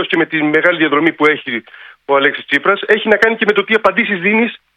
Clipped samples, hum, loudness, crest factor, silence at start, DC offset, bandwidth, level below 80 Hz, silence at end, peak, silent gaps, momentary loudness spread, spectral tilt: 0.1%; none; -13 LUFS; 14 dB; 0 s; under 0.1%; 9.6 kHz; -58 dBFS; 0.2 s; 0 dBFS; none; 4 LU; -5.5 dB/octave